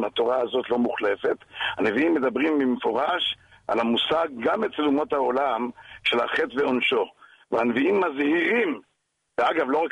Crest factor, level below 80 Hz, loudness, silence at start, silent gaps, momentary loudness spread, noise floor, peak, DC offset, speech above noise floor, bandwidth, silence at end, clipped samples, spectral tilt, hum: 14 dB; -64 dBFS; -24 LUFS; 0 s; none; 6 LU; -74 dBFS; -10 dBFS; under 0.1%; 50 dB; 10.5 kHz; 0 s; under 0.1%; -5.5 dB/octave; none